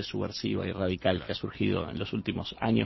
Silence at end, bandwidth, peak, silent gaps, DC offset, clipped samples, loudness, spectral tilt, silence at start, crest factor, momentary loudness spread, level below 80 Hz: 0 s; 6.2 kHz; -10 dBFS; none; under 0.1%; under 0.1%; -31 LUFS; -7 dB/octave; 0 s; 20 dB; 5 LU; -50 dBFS